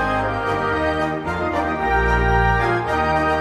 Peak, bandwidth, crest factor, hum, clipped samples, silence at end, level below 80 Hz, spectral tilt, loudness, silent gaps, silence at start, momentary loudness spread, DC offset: -4 dBFS; 12 kHz; 16 dB; none; under 0.1%; 0 s; -28 dBFS; -6.5 dB/octave; -20 LUFS; none; 0 s; 5 LU; under 0.1%